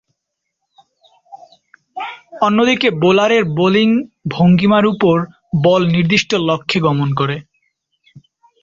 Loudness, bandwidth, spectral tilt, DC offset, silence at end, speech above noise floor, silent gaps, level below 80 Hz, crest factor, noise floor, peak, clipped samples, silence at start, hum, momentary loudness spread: -14 LUFS; 7.6 kHz; -6.5 dB/octave; under 0.1%; 0.45 s; 63 dB; none; -52 dBFS; 14 dB; -76 dBFS; -2 dBFS; under 0.1%; 1.3 s; none; 14 LU